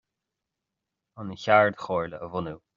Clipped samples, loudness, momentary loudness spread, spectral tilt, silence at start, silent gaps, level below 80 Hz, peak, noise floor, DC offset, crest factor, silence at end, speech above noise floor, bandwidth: under 0.1%; -25 LUFS; 17 LU; -4 dB/octave; 1.15 s; none; -64 dBFS; -4 dBFS; -86 dBFS; under 0.1%; 24 dB; 0.2 s; 60 dB; 7.4 kHz